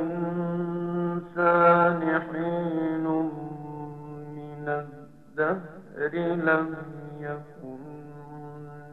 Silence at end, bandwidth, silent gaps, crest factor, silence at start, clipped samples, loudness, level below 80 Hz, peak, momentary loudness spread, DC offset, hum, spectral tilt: 0 s; 4.3 kHz; none; 20 dB; 0 s; under 0.1%; -26 LUFS; -64 dBFS; -8 dBFS; 20 LU; 0.2%; none; -9.5 dB/octave